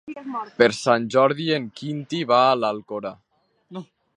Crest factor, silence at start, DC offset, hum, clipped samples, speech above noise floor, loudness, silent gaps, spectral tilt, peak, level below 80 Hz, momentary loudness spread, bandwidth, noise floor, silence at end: 22 dB; 0.05 s; under 0.1%; none; under 0.1%; 30 dB; -22 LUFS; none; -5 dB/octave; 0 dBFS; -68 dBFS; 20 LU; 11.5 kHz; -51 dBFS; 0.35 s